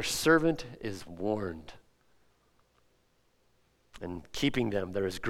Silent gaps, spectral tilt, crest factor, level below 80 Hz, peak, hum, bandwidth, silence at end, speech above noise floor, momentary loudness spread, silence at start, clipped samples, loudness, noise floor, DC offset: none; -4.5 dB/octave; 22 dB; -56 dBFS; -10 dBFS; none; 16.5 kHz; 0 s; 40 dB; 17 LU; 0 s; under 0.1%; -31 LUFS; -71 dBFS; under 0.1%